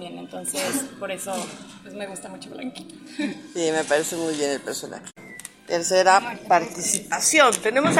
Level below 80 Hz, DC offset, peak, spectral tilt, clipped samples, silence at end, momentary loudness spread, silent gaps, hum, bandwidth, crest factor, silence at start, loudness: -66 dBFS; under 0.1%; -2 dBFS; -2.5 dB/octave; under 0.1%; 0 s; 21 LU; none; none; 16 kHz; 22 dB; 0 s; -22 LUFS